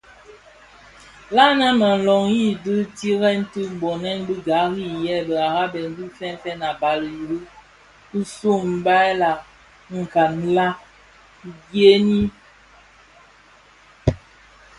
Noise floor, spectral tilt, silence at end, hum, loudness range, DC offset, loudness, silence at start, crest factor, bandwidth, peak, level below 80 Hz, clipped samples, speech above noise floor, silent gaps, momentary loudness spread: -51 dBFS; -6 dB/octave; 0.6 s; 50 Hz at -55 dBFS; 6 LU; under 0.1%; -20 LUFS; 1.3 s; 20 dB; 11.5 kHz; -2 dBFS; -46 dBFS; under 0.1%; 31 dB; none; 15 LU